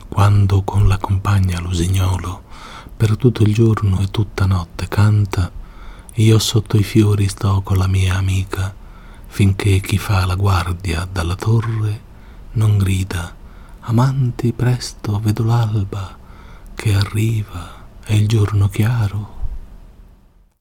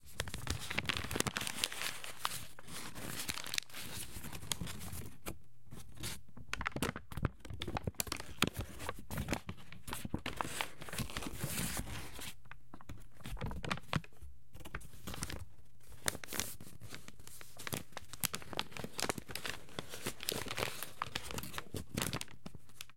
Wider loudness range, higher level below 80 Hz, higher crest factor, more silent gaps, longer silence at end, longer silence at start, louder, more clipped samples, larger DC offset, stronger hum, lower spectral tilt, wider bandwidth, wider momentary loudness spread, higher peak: about the same, 3 LU vs 5 LU; first, -34 dBFS vs -54 dBFS; second, 16 dB vs 36 dB; neither; first, 0.55 s vs 0 s; about the same, 0 s vs 0 s; first, -17 LUFS vs -41 LUFS; neither; second, under 0.1% vs 0.6%; neither; first, -6.5 dB/octave vs -3 dB/octave; about the same, 15.5 kHz vs 17 kHz; about the same, 15 LU vs 15 LU; first, 0 dBFS vs -6 dBFS